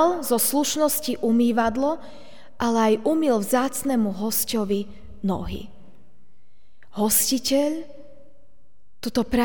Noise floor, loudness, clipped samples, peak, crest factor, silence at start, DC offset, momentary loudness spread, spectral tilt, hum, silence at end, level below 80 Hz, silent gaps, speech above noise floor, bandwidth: -64 dBFS; -22 LUFS; under 0.1%; -6 dBFS; 18 dB; 0 s; 2%; 13 LU; -3.5 dB/octave; none; 0 s; -48 dBFS; none; 42 dB; over 20 kHz